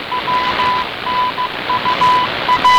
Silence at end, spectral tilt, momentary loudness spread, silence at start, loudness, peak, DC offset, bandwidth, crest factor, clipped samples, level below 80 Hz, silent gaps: 0 s; -3 dB/octave; 6 LU; 0 s; -15 LUFS; -6 dBFS; under 0.1%; over 20 kHz; 10 dB; under 0.1%; -44 dBFS; none